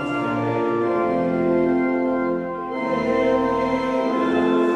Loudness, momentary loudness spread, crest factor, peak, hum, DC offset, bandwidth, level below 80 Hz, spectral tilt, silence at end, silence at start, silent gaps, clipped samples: -21 LUFS; 5 LU; 12 dB; -8 dBFS; none; under 0.1%; 8.8 kHz; -52 dBFS; -7.5 dB/octave; 0 s; 0 s; none; under 0.1%